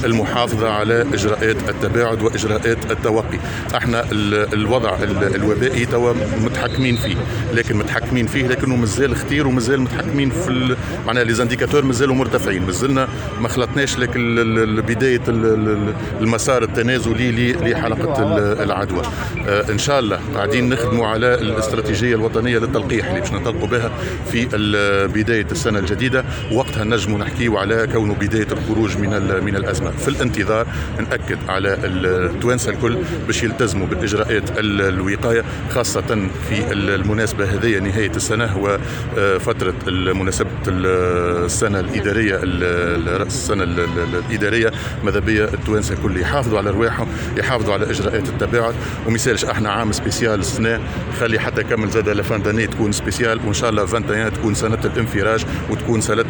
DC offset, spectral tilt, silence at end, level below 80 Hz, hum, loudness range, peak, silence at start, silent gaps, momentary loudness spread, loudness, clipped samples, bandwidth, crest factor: under 0.1%; -5.5 dB/octave; 0 s; -32 dBFS; none; 1 LU; -2 dBFS; 0 s; none; 4 LU; -18 LUFS; under 0.1%; 19.5 kHz; 14 dB